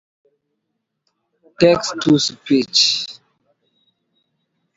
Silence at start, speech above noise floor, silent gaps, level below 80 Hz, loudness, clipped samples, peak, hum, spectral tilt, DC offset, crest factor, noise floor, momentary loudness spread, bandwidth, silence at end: 1.6 s; 59 dB; none; -58 dBFS; -16 LUFS; under 0.1%; 0 dBFS; none; -4 dB/octave; under 0.1%; 20 dB; -75 dBFS; 6 LU; 8 kHz; 1.65 s